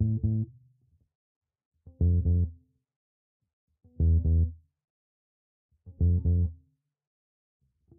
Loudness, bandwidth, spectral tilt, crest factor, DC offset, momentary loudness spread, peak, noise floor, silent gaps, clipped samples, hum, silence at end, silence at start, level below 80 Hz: -28 LUFS; 0.8 kHz; -18 dB/octave; 14 dB; under 0.1%; 8 LU; -16 dBFS; -66 dBFS; 1.15-1.41 s, 1.65-1.72 s, 2.96-3.40 s, 3.53-3.67 s, 4.84-5.69 s; under 0.1%; none; 1.45 s; 0 s; -36 dBFS